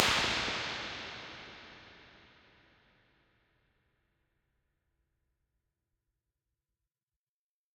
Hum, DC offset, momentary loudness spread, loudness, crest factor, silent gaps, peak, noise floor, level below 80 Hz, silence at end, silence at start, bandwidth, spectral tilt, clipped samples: none; under 0.1%; 25 LU; -34 LUFS; 38 dB; none; -4 dBFS; under -90 dBFS; -62 dBFS; 5.6 s; 0 s; 16 kHz; -1.5 dB/octave; under 0.1%